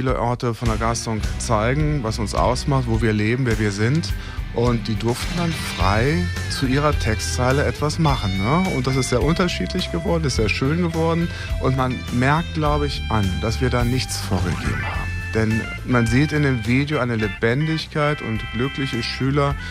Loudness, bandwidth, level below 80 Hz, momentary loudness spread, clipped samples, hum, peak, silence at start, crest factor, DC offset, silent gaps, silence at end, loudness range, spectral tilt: -21 LUFS; 15.5 kHz; -30 dBFS; 5 LU; under 0.1%; none; -4 dBFS; 0 s; 16 dB; under 0.1%; none; 0 s; 1 LU; -5.5 dB/octave